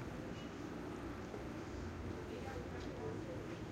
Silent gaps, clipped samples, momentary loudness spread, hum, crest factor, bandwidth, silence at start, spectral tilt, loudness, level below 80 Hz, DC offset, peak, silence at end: none; under 0.1%; 2 LU; none; 12 dB; 16 kHz; 0 s; -6.5 dB/octave; -47 LUFS; -56 dBFS; under 0.1%; -34 dBFS; 0 s